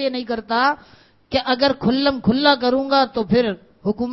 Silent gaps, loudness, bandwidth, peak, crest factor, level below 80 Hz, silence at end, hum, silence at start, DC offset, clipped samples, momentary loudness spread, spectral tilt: none; -19 LUFS; 6 kHz; 0 dBFS; 20 dB; -48 dBFS; 0 s; none; 0 s; under 0.1%; under 0.1%; 9 LU; -7.5 dB/octave